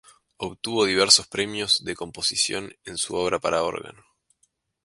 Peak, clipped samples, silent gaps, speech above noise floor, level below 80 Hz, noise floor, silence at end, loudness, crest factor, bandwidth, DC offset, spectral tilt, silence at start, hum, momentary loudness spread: 0 dBFS; under 0.1%; none; 45 dB; -58 dBFS; -70 dBFS; 0.95 s; -22 LUFS; 24 dB; 11.5 kHz; under 0.1%; -1.5 dB/octave; 0.4 s; none; 17 LU